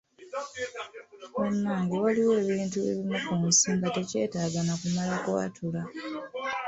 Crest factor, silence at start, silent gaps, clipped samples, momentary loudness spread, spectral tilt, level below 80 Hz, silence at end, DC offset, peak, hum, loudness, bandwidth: 18 dB; 0.2 s; none; under 0.1%; 14 LU; -4 dB/octave; -64 dBFS; 0 s; under 0.1%; -10 dBFS; none; -28 LUFS; 8.4 kHz